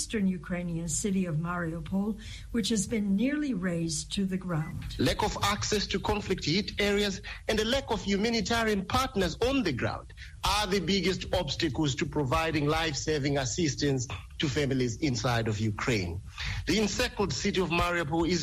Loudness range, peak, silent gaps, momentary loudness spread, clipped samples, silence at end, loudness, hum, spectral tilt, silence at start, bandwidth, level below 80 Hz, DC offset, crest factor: 2 LU; -14 dBFS; none; 6 LU; under 0.1%; 0 s; -29 LUFS; none; -4.5 dB/octave; 0 s; 15 kHz; -44 dBFS; under 0.1%; 16 dB